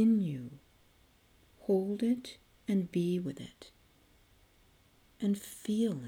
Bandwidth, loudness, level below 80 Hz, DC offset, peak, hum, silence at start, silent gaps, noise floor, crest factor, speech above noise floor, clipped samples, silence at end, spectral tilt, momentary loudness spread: 17.5 kHz; -34 LUFS; -70 dBFS; under 0.1%; -18 dBFS; none; 0 s; none; -65 dBFS; 16 dB; 33 dB; under 0.1%; 0 s; -7 dB/octave; 18 LU